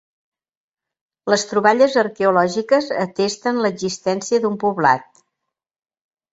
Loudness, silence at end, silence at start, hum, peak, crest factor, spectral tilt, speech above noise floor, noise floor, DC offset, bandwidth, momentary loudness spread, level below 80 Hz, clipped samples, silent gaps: -18 LUFS; 1.3 s; 1.25 s; none; -2 dBFS; 18 dB; -4 dB/octave; 64 dB; -81 dBFS; under 0.1%; 8 kHz; 7 LU; -64 dBFS; under 0.1%; none